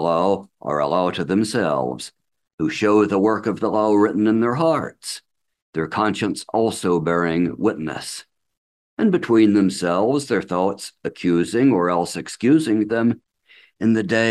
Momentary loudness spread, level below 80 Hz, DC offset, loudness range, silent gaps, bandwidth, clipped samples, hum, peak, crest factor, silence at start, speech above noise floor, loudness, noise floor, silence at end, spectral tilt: 12 LU; -58 dBFS; under 0.1%; 3 LU; 2.53-2.58 s, 5.62-5.73 s, 8.57-8.97 s; 12.5 kHz; under 0.1%; none; -4 dBFS; 16 dB; 0 s; 34 dB; -20 LUFS; -53 dBFS; 0 s; -6 dB/octave